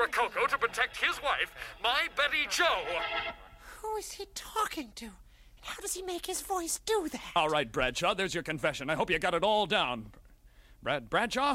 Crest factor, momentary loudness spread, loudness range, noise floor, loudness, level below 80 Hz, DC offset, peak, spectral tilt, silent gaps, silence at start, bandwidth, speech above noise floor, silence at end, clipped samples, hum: 18 dB; 13 LU; 7 LU; -57 dBFS; -31 LUFS; -54 dBFS; under 0.1%; -14 dBFS; -2.5 dB/octave; none; 0 s; 16 kHz; 26 dB; 0 s; under 0.1%; none